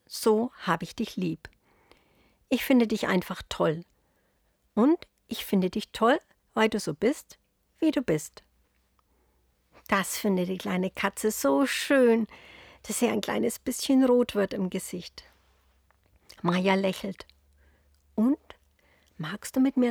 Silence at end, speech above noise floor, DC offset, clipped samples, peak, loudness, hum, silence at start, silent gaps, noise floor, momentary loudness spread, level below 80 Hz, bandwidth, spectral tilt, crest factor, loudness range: 0 s; 44 dB; under 0.1%; under 0.1%; -8 dBFS; -27 LUFS; none; 0.1 s; none; -70 dBFS; 14 LU; -62 dBFS; over 20 kHz; -5 dB/octave; 20 dB; 5 LU